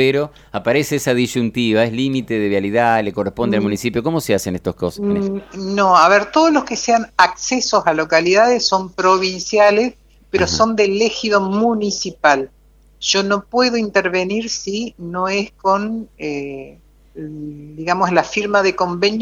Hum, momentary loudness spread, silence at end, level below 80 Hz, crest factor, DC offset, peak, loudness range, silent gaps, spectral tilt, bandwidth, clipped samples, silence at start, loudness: none; 12 LU; 0 s; -48 dBFS; 16 dB; under 0.1%; 0 dBFS; 6 LU; none; -4 dB/octave; 17 kHz; under 0.1%; 0 s; -17 LUFS